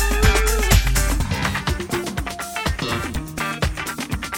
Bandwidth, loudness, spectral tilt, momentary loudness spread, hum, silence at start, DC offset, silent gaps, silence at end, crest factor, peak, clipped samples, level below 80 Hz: 17 kHz; -22 LUFS; -4 dB/octave; 10 LU; none; 0 s; under 0.1%; none; 0 s; 20 dB; 0 dBFS; under 0.1%; -24 dBFS